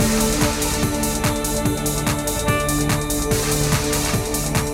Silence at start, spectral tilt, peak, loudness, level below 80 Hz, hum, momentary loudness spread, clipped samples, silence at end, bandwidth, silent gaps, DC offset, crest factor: 0 s; -4 dB/octave; -2 dBFS; -20 LUFS; -30 dBFS; none; 2 LU; under 0.1%; 0 s; 17 kHz; none; under 0.1%; 18 dB